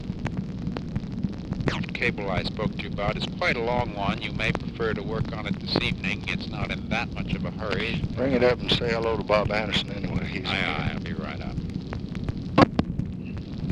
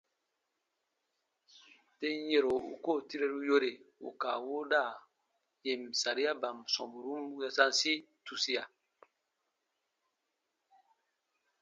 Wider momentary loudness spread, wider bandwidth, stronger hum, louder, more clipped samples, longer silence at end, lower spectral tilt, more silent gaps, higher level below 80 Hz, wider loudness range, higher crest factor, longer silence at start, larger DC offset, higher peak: about the same, 10 LU vs 11 LU; first, 10.5 kHz vs 8.8 kHz; neither; first, -27 LUFS vs -34 LUFS; neither; second, 0 s vs 2.95 s; first, -6.5 dB/octave vs -1 dB/octave; neither; first, -40 dBFS vs -82 dBFS; about the same, 3 LU vs 4 LU; about the same, 26 dB vs 26 dB; second, 0 s vs 2 s; neither; first, 0 dBFS vs -12 dBFS